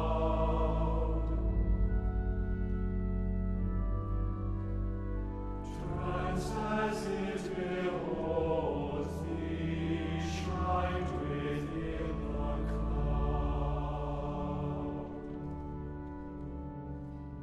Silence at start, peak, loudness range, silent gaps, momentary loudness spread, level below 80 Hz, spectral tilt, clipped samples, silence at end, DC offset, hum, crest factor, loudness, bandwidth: 0 s; -18 dBFS; 3 LU; none; 9 LU; -38 dBFS; -7.5 dB/octave; under 0.1%; 0 s; under 0.1%; none; 14 dB; -36 LUFS; 10 kHz